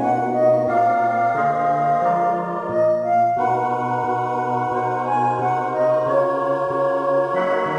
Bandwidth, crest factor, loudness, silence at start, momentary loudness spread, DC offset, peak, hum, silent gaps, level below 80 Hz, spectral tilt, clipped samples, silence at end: 11 kHz; 12 dB; -20 LUFS; 0 s; 4 LU; under 0.1%; -6 dBFS; none; none; -66 dBFS; -7.5 dB/octave; under 0.1%; 0 s